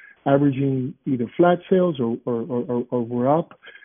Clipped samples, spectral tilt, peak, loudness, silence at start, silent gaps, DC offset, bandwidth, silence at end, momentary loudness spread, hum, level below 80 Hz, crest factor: under 0.1%; -7.5 dB/octave; -4 dBFS; -22 LUFS; 0.25 s; none; under 0.1%; 3.6 kHz; 0.15 s; 7 LU; none; -62 dBFS; 18 dB